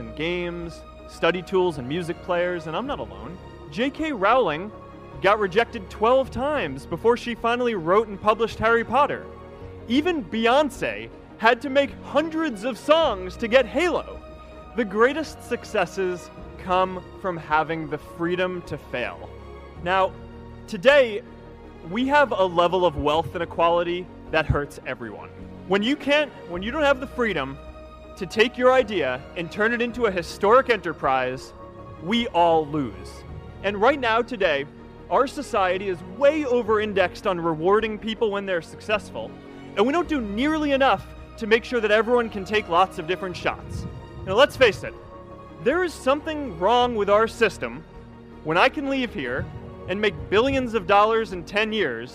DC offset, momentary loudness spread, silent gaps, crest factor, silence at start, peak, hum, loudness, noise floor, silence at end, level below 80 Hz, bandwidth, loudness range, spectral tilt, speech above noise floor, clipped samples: under 0.1%; 18 LU; none; 22 dB; 0 s; 0 dBFS; none; -23 LUFS; -42 dBFS; 0 s; -46 dBFS; 14.5 kHz; 4 LU; -5.5 dB/octave; 20 dB; under 0.1%